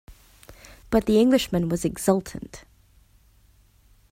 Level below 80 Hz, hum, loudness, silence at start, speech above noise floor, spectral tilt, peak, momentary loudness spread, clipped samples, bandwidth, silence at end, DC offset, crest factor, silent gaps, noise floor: -48 dBFS; none; -22 LUFS; 0.1 s; 36 dB; -5.5 dB/octave; -6 dBFS; 19 LU; under 0.1%; 16 kHz; 1.55 s; under 0.1%; 20 dB; none; -58 dBFS